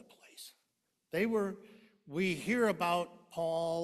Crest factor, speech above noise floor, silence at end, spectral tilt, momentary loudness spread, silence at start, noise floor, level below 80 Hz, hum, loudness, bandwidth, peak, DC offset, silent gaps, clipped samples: 18 dB; 49 dB; 0 s; -5.5 dB/octave; 20 LU; 0.35 s; -82 dBFS; -72 dBFS; none; -34 LUFS; 14.5 kHz; -18 dBFS; under 0.1%; none; under 0.1%